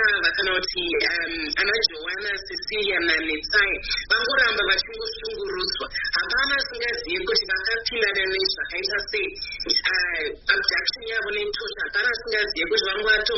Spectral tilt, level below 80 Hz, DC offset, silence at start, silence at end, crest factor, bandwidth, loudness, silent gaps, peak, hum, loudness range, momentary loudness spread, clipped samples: 1.5 dB/octave; -46 dBFS; under 0.1%; 0 s; 0 s; 20 dB; 6 kHz; -22 LUFS; none; -4 dBFS; none; 2 LU; 7 LU; under 0.1%